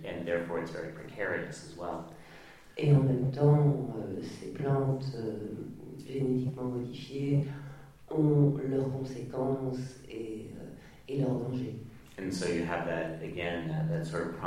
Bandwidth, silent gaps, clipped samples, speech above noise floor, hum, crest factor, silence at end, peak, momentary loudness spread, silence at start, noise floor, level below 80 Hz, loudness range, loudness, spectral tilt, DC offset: 11 kHz; none; under 0.1%; 22 dB; none; 18 dB; 0 s; -14 dBFS; 19 LU; 0 s; -53 dBFS; -60 dBFS; 6 LU; -32 LUFS; -8 dB/octave; under 0.1%